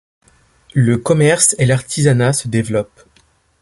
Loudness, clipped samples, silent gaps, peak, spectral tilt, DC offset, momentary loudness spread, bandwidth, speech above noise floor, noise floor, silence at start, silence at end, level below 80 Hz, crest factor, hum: -14 LUFS; under 0.1%; none; 0 dBFS; -5 dB/octave; under 0.1%; 10 LU; 11.5 kHz; 41 dB; -55 dBFS; 0.75 s; 0.75 s; -48 dBFS; 16 dB; none